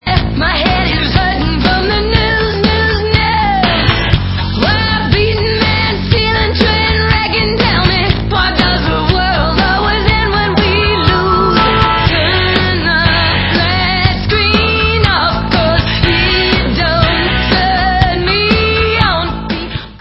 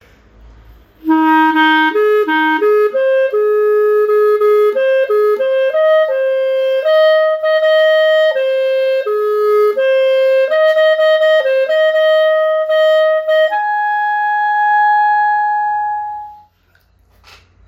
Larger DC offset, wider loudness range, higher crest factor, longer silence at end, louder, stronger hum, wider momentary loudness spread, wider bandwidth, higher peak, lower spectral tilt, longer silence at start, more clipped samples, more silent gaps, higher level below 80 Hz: neither; about the same, 1 LU vs 2 LU; about the same, 12 dB vs 12 dB; second, 0.05 s vs 1.35 s; about the same, -11 LUFS vs -12 LUFS; neither; about the same, 3 LU vs 5 LU; second, 8 kHz vs 15.5 kHz; about the same, 0 dBFS vs -2 dBFS; first, -7.5 dB/octave vs -3.5 dB/octave; second, 0.05 s vs 1.05 s; first, 0.1% vs under 0.1%; neither; first, -20 dBFS vs -54 dBFS